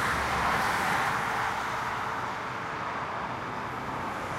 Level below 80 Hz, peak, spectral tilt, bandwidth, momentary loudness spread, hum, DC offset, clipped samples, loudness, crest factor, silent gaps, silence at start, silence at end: -50 dBFS; -16 dBFS; -3.5 dB/octave; 16 kHz; 8 LU; none; under 0.1%; under 0.1%; -30 LUFS; 16 dB; none; 0 s; 0 s